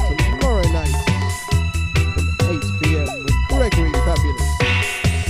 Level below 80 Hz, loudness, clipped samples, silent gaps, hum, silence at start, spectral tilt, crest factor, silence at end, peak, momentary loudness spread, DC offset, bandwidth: -22 dBFS; -19 LUFS; under 0.1%; none; none; 0 s; -5 dB/octave; 14 dB; 0 s; -4 dBFS; 3 LU; under 0.1%; 15.5 kHz